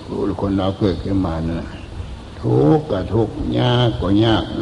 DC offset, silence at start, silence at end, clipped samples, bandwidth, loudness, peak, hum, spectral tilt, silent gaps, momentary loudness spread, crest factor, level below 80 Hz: under 0.1%; 0 s; 0 s; under 0.1%; 10.5 kHz; -18 LUFS; -2 dBFS; none; -8 dB/octave; none; 16 LU; 16 dB; -34 dBFS